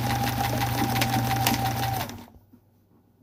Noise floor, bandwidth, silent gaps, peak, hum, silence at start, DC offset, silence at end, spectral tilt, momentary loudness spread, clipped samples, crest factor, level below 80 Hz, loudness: -61 dBFS; 16.5 kHz; none; -6 dBFS; none; 0 s; under 0.1%; 0.85 s; -4.5 dB/octave; 8 LU; under 0.1%; 22 dB; -44 dBFS; -26 LUFS